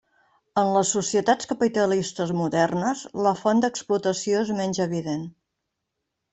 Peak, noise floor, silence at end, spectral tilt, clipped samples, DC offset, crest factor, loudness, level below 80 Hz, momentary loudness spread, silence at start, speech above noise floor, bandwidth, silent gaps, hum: -6 dBFS; -81 dBFS; 1 s; -4.5 dB/octave; under 0.1%; under 0.1%; 18 dB; -24 LUFS; -64 dBFS; 6 LU; 0.55 s; 58 dB; 8.4 kHz; none; none